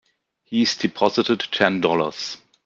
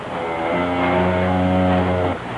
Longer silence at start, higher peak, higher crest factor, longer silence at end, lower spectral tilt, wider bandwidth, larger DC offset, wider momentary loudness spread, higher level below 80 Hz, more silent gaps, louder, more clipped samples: first, 0.5 s vs 0 s; first, -2 dBFS vs -6 dBFS; first, 20 dB vs 12 dB; first, 0.3 s vs 0 s; second, -4.5 dB/octave vs -8 dB/octave; second, 7.6 kHz vs 10.5 kHz; neither; first, 8 LU vs 5 LU; second, -64 dBFS vs -50 dBFS; neither; about the same, -21 LUFS vs -19 LUFS; neither